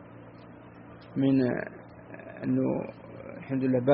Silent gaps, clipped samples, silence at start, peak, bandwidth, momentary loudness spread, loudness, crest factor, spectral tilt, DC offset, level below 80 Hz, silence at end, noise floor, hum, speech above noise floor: none; under 0.1%; 0 s; -10 dBFS; 4.7 kHz; 23 LU; -29 LUFS; 20 dB; -8 dB/octave; under 0.1%; -64 dBFS; 0 s; -48 dBFS; none; 22 dB